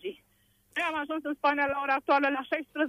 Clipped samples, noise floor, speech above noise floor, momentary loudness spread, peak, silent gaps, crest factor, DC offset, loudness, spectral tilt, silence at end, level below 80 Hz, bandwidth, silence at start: under 0.1%; -68 dBFS; 39 dB; 8 LU; -14 dBFS; none; 16 dB; under 0.1%; -29 LUFS; -4 dB/octave; 0 s; -70 dBFS; 15.5 kHz; 0.05 s